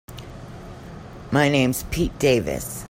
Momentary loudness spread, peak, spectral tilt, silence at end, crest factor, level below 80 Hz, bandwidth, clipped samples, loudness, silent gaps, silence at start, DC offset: 20 LU; -4 dBFS; -5 dB/octave; 0 s; 20 dB; -40 dBFS; 16.5 kHz; under 0.1%; -21 LUFS; none; 0.1 s; under 0.1%